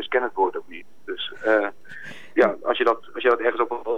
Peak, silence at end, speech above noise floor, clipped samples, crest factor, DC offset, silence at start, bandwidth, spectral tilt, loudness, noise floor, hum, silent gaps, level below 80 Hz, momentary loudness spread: -6 dBFS; 0 s; 18 dB; under 0.1%; 16 dB; 1%; 0 s; 8 kHz; -5 dB/octave; -23 LUFS; -41 dBFS; none; none; -68 dBFS; 18 LU